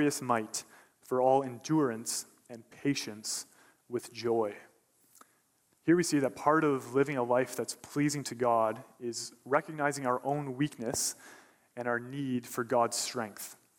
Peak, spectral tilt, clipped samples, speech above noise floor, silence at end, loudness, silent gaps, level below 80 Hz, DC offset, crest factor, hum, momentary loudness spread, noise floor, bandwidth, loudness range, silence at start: -12 dBFS; -4.5 dB/octave; under 0.1%; 40 dB; 0.25 s; -32 LUFS; none; -74 dBFS; under 0.1%; 20 dB; none; 12 LU; -72 dBFS; 16.5 kHz; 5 LU; 0 s